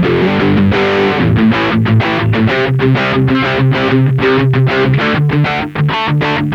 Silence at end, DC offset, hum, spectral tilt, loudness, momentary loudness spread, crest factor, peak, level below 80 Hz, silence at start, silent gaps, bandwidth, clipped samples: 0 s; under 0.1%; none; -8 dB/octave; -12 LUFS; 2 LU; 10 dB; -2 dBFS; -36 dBFS; 0 s; none; 6.8 kHz; under 0.1%